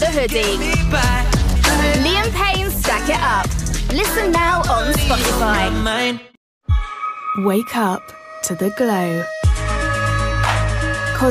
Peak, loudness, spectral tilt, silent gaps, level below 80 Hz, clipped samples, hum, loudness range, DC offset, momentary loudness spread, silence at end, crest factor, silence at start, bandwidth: -4 dBFS; -18 LUFS; -4.5 dB/octave; 6.37-6.61 s; -24 dBFS; under 0.1%; none; 4 LU; under 0.1%; 6 LU; 0 s; 14 dB; 0 s; 16 kHz